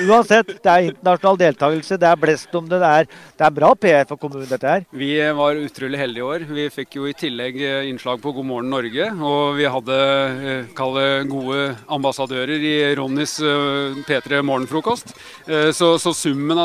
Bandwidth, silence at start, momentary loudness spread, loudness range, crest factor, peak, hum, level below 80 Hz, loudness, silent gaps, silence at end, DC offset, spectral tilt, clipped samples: 15.5 kHz; 0 s; 10 LU; 6 LU; 16 dB; -2 dBFS; none; -62 dBFS; -18 LUFS; none; 0 s; under 0.1%; -4.5 dB/octave; under 0.1%